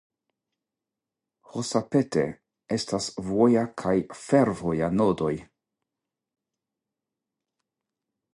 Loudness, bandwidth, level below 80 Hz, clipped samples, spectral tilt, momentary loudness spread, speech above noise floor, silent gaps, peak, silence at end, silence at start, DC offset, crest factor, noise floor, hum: -26 LUFS; 11.5 kHz; -58 dBFS; under 0.1%; -6 dB/octave; 10 LU; 63 dB; none; -8 dBFS; 2.9 s; 1.55 s; under 0.1%; 20 dB; -88 dBFS; none